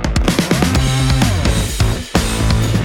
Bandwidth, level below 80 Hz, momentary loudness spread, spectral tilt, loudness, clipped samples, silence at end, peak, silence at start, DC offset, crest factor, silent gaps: 18 kHz; -20 dBFS; 3 LU; -5 dB/octave; -15 LUFS; under 0.1%; 0 s; 0 dBFS; 0 s; under 0.1%; 14 dB; none